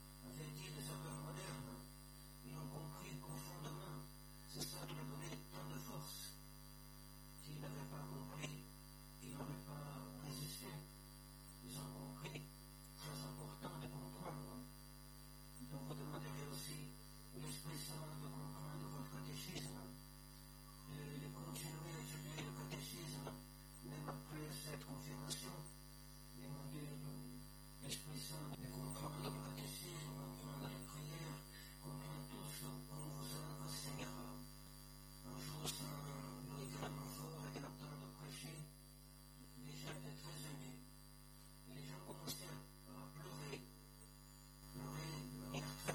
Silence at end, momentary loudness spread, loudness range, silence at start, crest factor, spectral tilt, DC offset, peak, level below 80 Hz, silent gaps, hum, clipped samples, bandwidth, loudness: 0 s; 10 LU; 4 LU; 0 s; 24 dB; -4.5 dB/octave; under 0.1%; -28 dBFS; -64 dBFS; none; 50 Hz at -55 dBFS; under 0.1%; 19 kHz; -52 LUFS